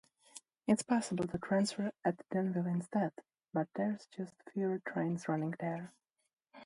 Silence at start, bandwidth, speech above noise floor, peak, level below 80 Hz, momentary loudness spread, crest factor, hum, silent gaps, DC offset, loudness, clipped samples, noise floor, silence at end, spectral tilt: 0.35 s; 11.5 kHz; 23 dB; -18 dBFS; -72 dBFS; 12 LU; 18 dB; none; 6.33-6.37 s; under 0.1%; -37 LUFS; under 0.1%; -59 dBFS; 0 s; -6 dB/octave